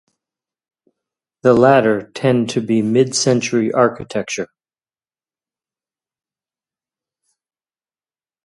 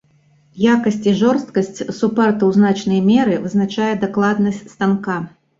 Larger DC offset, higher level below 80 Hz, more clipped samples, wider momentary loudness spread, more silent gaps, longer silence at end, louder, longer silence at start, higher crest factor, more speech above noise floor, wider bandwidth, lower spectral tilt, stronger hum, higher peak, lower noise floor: neither; about the same, -58 dBFS vs -56 dBFS; neither; first, 13 LU vs 7 LU; neither; first, 4 s vs 0.3 s; about the same, -16 LUFS vs -17 LUFS; first, 1.45 s vs 0.55 s; first, 20 dB vs 14 dB; first, over 75 dB vs 39 dB; first, 11.5 kHz vs 7.6 kHz; second, -5 dB/octave vs -7 dB/octave; neither; about the same, 0 dBFS vs -2 dBFS; first, under -90 dBFS vs -55 dBFS